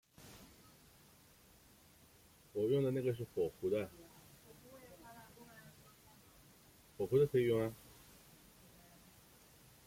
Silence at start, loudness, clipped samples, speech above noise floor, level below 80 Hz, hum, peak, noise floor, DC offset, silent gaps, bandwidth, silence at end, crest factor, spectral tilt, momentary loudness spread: 0.2 s; -37 LUFS; under 0.1%; 30 dB; -72 dBFS; none; -22 dBFS; -65 dBFS; under 0.1%; none; 16.5 kHz; 2.1 s; 20 dB; -7 dB/octave; 28 LU